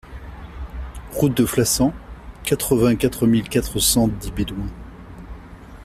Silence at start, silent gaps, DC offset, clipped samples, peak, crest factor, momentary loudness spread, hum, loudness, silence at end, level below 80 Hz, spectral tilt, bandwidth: 0.05 s; none; under 0.1%; under 0.1%; -4 dBFS; 18 dB; 22 LU; none; -20 LUFS; 0 s; -36 dBFS; -4.5 dB/octave; 16 kHz